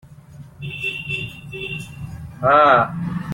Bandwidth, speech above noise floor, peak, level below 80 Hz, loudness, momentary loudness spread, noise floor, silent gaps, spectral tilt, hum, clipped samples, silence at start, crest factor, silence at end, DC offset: 16.5 kHz; 23 dB; -2 dBFS; -50 dBFS; -18 LUFS; 21 LU; -41 dBFS; none; -6.5 dB/octave; none; under 0.1%; 0.05 s; 18 dB; 0 s; under 0.1%